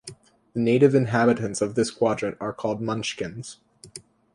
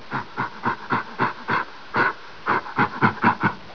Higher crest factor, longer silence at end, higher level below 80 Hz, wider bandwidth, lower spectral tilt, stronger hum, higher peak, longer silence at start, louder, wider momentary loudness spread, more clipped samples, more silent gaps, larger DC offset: about the same, 20 dB vs 20 dB; first, 0.35 s vs 0 s; about the same, -60 dBFS vs -60 dBFS; first, 11.5 kHz vs 5.4 kHz; about the same, -6 dB/octave vs -7 dB/octave; neither; about the same, -4 dBFS vs -4 dBFS; about the same, 0.05 s vs 0 s; about the same, -24 LUFS vs -24 LUFS; first, 24 LU vs 8 LU; neither; neither; second, under 0.1% vs 0.9%